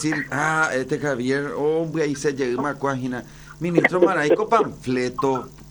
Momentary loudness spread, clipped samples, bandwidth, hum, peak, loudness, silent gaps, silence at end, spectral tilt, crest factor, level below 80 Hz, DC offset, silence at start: 9 LU; under 0.1%; over 20 kHz; none; -4 dBFS; -22 LUFS; none; 0 s; -5.5 dB/octave; 18 dB; -52 dBFS; under 0.1%; 0 s